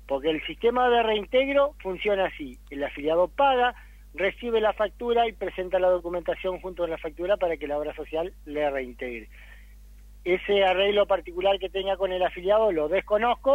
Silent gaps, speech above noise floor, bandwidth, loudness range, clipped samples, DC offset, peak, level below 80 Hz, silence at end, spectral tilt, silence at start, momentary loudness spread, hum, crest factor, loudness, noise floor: none; 22 dB; 15.5 kHz; 6 LU; under 0.1%; under 0.1%; -10 dBFS; -48 dBFS; 0 s; -5.5 dB/octave; 0 s; 10 LU; 50 Hz at -45 dBFS; 16 dB; -25 LUFS; -47 dBFS